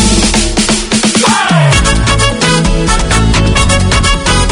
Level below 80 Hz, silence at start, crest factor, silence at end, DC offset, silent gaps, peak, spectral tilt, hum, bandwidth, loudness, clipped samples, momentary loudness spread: -16 dBFS; 0 s; 8 dB; 0 s; under 0.1%; none; 0 dBFS; -3.5 dB/octave; none; 11 kHz; -9 LUFS; 0.3%; 2 LU